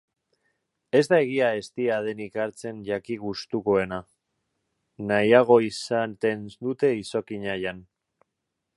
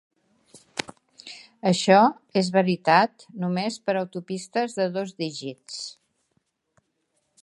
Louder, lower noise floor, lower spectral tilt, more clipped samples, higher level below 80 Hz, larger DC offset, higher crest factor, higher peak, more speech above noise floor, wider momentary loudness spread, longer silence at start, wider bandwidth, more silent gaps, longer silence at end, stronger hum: about the same, -25 LUFS vs -24 LUFS; first, -82 dBFS vs -74 dBFS; about the same, -5.5 dB/octave vs -5 dB/octave; neither; first, -62 dBFS vs -74 dBFS; neither; about the same, 22 dB vs 22 dB; about the same, -4 dBFS vs -4 dBFS; first, 58 dB vs 50 dB; second, 13 LU vs 19 LU; first, 0.95 s vs 0.55 s; about the same, 11.5 kHz vs 11.5 kHz; neither; second, 0.95 s vs 1.5 s; neither